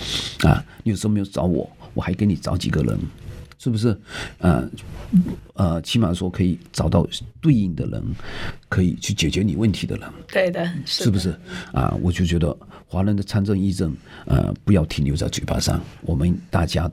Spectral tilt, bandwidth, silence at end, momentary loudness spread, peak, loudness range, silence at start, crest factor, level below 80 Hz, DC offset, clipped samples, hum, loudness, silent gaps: -6 dB/octave; 15 kHz; 0 s; 10 LU; -2 dBFS; 2 LU; 0 s; 18 dB; -34 dBFS; under 0.1%; under 0.1%; none; -22 LUFS; none